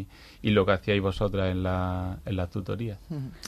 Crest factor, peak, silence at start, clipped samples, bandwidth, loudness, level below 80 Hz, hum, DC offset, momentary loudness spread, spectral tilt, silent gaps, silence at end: 18 dB; -10 dBFS; 0 s; under 0.1%; 13 kHz; -28 LUFS; -44 dBFS; none; under 0.1%; 11 LU; -7 dB/octave; none; 0 s